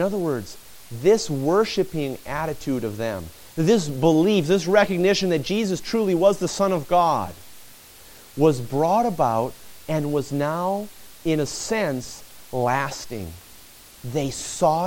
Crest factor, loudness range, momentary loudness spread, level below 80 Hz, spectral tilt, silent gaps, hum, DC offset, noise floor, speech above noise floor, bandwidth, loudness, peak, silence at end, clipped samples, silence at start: 18 dB; 6 LU; 16 LU; -50 dBFS; -5.5 dB/octave; none; none; under 0.1%; -47 dBFS; 25 dB; 17 kHz; -22 LUFS; -4 dBFS; 0 s; under 0.1%; 0 s